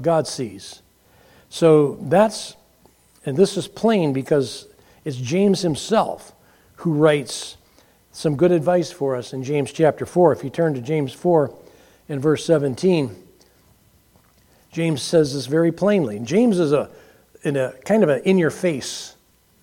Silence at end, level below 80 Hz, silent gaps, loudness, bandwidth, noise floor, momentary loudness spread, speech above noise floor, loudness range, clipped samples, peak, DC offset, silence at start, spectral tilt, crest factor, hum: 0.5 s; -60 dBFS; none; -20 LUFS; 16.5 kHz; -56 dBFS; 14 LU; 37 dB; 3 LU; under 0.1%; -2 dBFS; under 0.1%; 0 s; -6 dB/octave; 20 dB; none